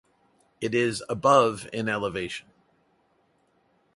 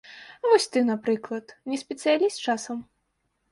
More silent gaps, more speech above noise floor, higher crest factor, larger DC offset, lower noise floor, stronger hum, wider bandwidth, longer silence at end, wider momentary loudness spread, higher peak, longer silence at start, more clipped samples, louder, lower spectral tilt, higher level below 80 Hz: neither; second, 43 dB vs 50 dB; about the same, 24 dB vs 20 dB; neither; second, -67 dBFS vs -75 dBFS; neither; about the same, 11.5 kHz vs 11.5 kHz; first, 1.55 s vs 0.7 s; about the same, 14 LU vs 14 LU; about the same, -4 dBFS vs -6 dBFS; first, 0.6 s vs 0.1 s; neither; about the same, -25 LUFS vs -25 LUFS; first, -5 dB/octave vs -3.5 dB/octave; first, -62 dBFS vs -74 dBFS